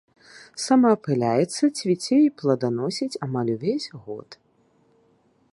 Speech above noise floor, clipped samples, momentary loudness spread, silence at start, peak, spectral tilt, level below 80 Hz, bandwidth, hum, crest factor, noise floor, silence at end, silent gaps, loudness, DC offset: 40 dB; under 0.1%; 15 LU; 0.35 s; -6 dBFS; -6 dB/octave; -70 dBFS; 11.5 kHz; none; 18 dB; -62 dBFS; 1.2 s; none; -23 LUFS; under 0.1%